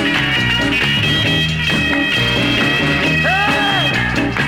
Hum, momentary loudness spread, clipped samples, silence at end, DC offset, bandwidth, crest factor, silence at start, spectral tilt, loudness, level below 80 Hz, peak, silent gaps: none; 2 LU; under 0.1%; 0 s; under 0.1%; 16.5 kHz; 12 dB; 0 s; -4.5 dB/octave; -14 LUFS; -34 dBFS; -4 dBFS; none